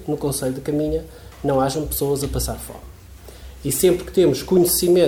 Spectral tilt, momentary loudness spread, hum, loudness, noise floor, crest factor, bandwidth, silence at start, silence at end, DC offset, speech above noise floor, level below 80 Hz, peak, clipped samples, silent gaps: -5 dB/octave; 18 LU; none; -20 LUFS; -41 dBFS; 16 dB; 18.5 kHz; 0 s; 0 s; under 0.1%; 22 dB; -38 dBFS; -4 dBFS; under 0.1%; none